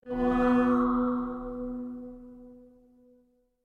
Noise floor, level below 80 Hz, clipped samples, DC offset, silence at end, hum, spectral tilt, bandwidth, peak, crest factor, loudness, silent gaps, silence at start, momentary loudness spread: -66 dBFS; -48 dBFS; under 0.1%; under 0.1%; 1.05 s; none; -8 dB/octave; 4.4 kHz; -14 dBFS; 16 dB; -28 LUFS; none; 0.05 s; 21 LU